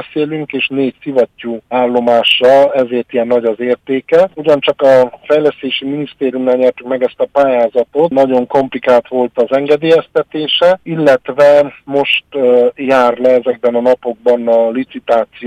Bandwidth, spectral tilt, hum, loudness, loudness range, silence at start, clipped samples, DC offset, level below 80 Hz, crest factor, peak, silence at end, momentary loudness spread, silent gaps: 9.2 kHz; -6 dB/octave; none; -12 LUFS; 2 LU; 0 s; under 0.1%; under 0.1%; -56 dBFS; 10 dB; 0 dBFS; 0 s; 8 LU; none